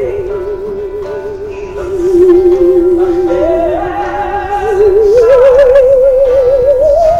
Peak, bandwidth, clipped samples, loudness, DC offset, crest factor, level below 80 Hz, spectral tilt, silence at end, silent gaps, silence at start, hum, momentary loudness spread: 0 dBFS; 8.4 kHz; 0.3%; -9 LUFS; under 0.1%; 8 dB; -28 dBFS; -7.5 dB/octave; 0 s; none; 0 s; none; 14 LU